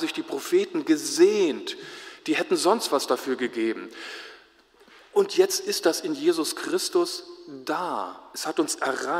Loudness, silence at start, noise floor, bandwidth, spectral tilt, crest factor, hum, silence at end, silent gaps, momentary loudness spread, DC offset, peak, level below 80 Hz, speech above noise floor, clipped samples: -25 LUFS; 0 s; -56 dBFS; 16 kHz; -2.5 dB/octave; 20 dB; none; 0 s; none; 15 LU; under 0.1%; -6 dBFS; -76 dBFS; 31 dB; under 0.1%